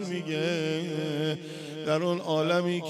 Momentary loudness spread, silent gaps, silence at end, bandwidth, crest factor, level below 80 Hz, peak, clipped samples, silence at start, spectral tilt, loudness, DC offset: 8 LU; none; 0 s; 13.5 kHz; 14 dB; -76 dBFS; -14 dBFS; under 0.1%; 0 s; -6 dB/octave; -29 LUFS; under 0.1%